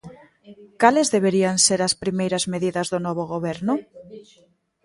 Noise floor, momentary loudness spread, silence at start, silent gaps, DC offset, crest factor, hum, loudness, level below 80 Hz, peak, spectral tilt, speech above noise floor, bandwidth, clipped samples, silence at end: -60 dBFS; 9 LU; 0.05 s; none; under 0.1%; 22 dB; none; -21 LUFS; -60 dBFS; -2 dBFS; -3.5 dB/octave; 39 dB; 11.5 kHz; under 0.1%; 0.65 s